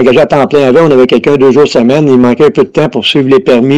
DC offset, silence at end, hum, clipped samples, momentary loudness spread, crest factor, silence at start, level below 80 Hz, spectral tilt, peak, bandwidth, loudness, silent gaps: under 0.1%; 0 s; none; 2%; 3 LU; 6 dB; 0 s; -42 dBFS; -6.5 dB/octave; 0 dBFS; 10.5 kHz; -6 LUFS; none